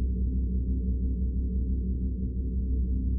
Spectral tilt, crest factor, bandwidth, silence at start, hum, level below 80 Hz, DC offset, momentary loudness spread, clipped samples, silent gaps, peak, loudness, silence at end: -19.5 dB/octave; 8 dB; 0.6 kHz; 0 s; none; -28 dBFS; under 0.1%; 2 LU; under 0.1%; none; -20 dBFS; -31 LUFS; 0 s